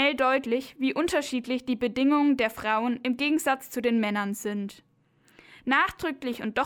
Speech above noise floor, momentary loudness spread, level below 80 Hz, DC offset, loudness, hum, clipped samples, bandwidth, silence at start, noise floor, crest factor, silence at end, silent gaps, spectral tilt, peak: 37 dB; 9 LU; -60 dBFS; under 0.1%; -26 LUFS; none; under 0.1%; 19.5 kHz; 0 s; -63 dBFS; 16 dB; 0 s; none; -4 dB/octave; -10 dBFS